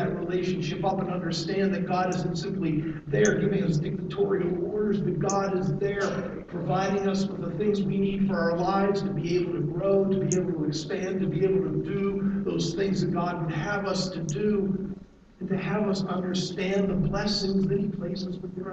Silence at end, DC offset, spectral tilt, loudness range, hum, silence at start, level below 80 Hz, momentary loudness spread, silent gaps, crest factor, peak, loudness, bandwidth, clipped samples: 0 s; under 0.1%; -6 dB/octave; 2 LU; none; 0 s; -50 dBFS; 5 LU; none; 18 dB; -10 dBFS; -27 LUFS; 8.2 kHz; under 0.1%